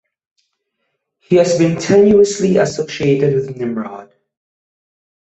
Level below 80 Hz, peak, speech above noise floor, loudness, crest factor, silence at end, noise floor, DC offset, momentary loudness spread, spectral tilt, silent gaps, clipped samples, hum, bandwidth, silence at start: -52 dBFS; -2 dBFS; 58 dB; -14 LUFS; 14 dB; 1.2 s; -72 dBFS; under 0.1%; 12 LU; -6 dB/octave; none; under 0.1%; none; 8.2 kHz; 1.3 s